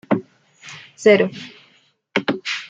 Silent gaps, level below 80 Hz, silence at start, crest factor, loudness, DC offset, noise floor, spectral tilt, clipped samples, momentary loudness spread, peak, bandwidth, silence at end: none; -66 dBFS; 0.1 s; 20 dB; -19 LUFS; under 0.1%; -58 dBFS; -5 dB/octave; under 0.1%; 23 LU; -2 dBFS; 8.6 kHz; 0.05 s